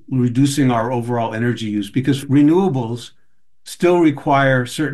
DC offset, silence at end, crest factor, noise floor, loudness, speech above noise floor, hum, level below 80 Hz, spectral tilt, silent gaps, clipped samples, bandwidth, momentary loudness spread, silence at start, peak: 0.7%; 0 s; 14 dB; -61 dBFS; -17 LUFS; 44 dB; none; -54 dBFS; -6.5 dB/octave; none; under 0.1%; 12.5 kHz; 8 LU; 0.1 s; -2 dBFS